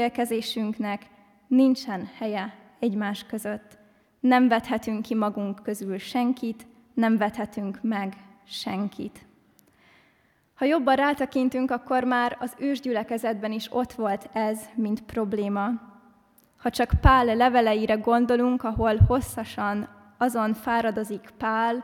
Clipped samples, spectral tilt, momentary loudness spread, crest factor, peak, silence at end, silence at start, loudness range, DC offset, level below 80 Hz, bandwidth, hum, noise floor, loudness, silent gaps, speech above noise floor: under 0.1%; -6.5 dB/octave; 12 LU; 22 dB; -4 dBFS; 0 s; 0 s; 7 LU; under 0.1%; -40 dBFS; 16.5 kHz; none; -64 dBFS; -25 LUFS; none; 40 dB